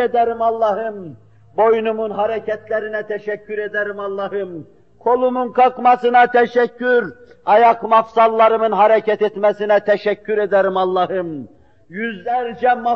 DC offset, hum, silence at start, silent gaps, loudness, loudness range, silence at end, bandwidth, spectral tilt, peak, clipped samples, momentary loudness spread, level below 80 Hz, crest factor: 0.2%; none; 0 s; none; -17 LUFS; 7 LU; 0 s; 6.4 kHz; -3 dB/octave; -2 dBFS; under 0.1%; 13 LU; -62 dBFS; 14 dB